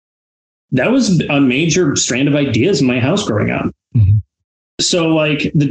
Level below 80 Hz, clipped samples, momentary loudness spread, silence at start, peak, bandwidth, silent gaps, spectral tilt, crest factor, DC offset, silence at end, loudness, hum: -42 dBFS; under 0.1%; 5 LU; 0.7 s; -4 dBFS; 9.2 kHz; 4.44-4.78 s; -5 dB/octave; 10 dB; under 0.1%; 0 s; -14 LUFS; none